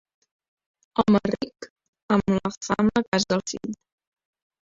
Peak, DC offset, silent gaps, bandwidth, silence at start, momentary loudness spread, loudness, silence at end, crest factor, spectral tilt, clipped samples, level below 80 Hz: -6 dBFS; under 0.1%; 1.70-1.76 s, 1.88-1.93 s, 2.03-2.09 s, 2.57-2.61 s, 3.08-3.12 s; 7.8 kHz; 0.95 s; 15 LU; -24 LUFS; 0.95 s; 20 dB; -5.5 dB/octave; under 0.1%; -54 dBFS